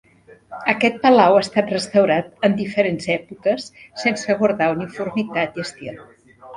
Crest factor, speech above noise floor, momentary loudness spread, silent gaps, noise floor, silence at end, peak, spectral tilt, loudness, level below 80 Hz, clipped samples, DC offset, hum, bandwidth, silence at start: 18 dB; 24 dB; 13 LU; none; -43 dBFS; 0 s; 0 dBFS; -5.5 dB/octave; -19 LUFS; -60 dBFS; under 0.1%; under 0.1%; none; 11 kHz; 0.5 s